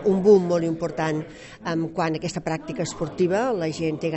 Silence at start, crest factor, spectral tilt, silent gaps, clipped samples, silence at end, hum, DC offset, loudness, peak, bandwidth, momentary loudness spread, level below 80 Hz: 0 s; 18 dB; -6.5 dB/octave; none; under 0.1%; 0 s; none; under 0.1%; -24 LUFS; -4 dBFS; 8.2 kHz; 12 LU; -54 dBFS